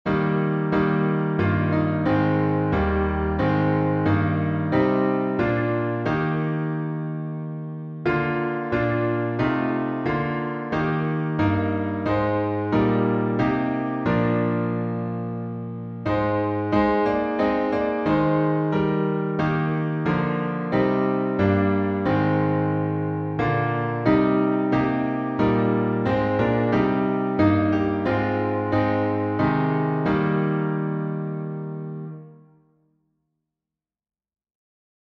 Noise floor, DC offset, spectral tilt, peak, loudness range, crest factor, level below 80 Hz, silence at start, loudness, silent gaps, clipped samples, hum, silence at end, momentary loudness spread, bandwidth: -89 dBFS; under 0.1%; -9.5 dB/octave; -6 dBFS; 4 LU; 16 dB; -44 dBFS; 0.05 s; -23 LUFS; none; under 0.1%; none; 2.65 s; 7 LU; 6.2 kHz